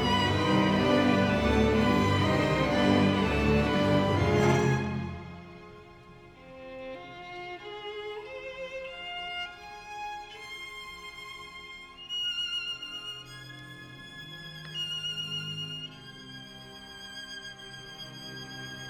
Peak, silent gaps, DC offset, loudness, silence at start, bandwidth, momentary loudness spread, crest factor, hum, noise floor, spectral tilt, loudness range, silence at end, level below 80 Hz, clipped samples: -10 dBFS; none; under 0.1%; -28 LUFS; 0 s; 16 kHz; 20 LU; 20 dB; none; -51 dBFS; -5.5 dB/octave; 15 LU; 0 s; -46 dBFS; under 0.1%